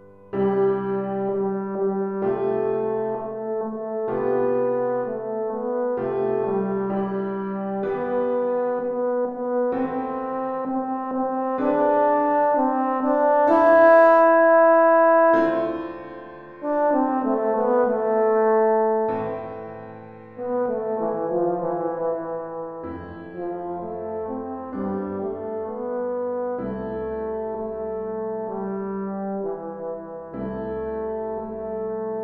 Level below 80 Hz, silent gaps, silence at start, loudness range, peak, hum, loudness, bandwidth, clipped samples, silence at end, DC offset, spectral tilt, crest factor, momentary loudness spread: -56 dBFS; none; 0 s; 13 LU; -4 dBFS; none; -23 LUFS; 4.9 kHz; under 0.1%; 0 s; under 0.1%; -9.5 dB/octave; 18 dB; 16 LU